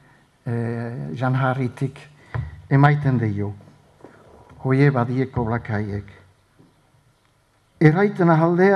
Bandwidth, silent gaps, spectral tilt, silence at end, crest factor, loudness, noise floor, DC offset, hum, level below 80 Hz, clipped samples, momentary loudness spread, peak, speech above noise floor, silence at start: 6.4 kHz; none; -9.5 dB/octave; 0 s; 20 dB; -21 LUFS; -61 dBFS; under 0.1%; none; -50 dBFS; under 0.1%; 15 LU; 0 dBFS; 42 dB; 0.45 s